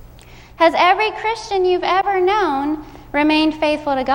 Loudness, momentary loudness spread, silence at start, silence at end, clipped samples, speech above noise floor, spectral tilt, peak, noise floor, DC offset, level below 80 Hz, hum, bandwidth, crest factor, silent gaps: -17 LUFS; 8 LU; 0.3 s; 0 s; under 0.1%; 25 dB; -4.5 dB/octave; -2 dBFS; -41 dBFS; under 0.1%; -44 dBFS; none; 16.5 kHz; 16 dB; none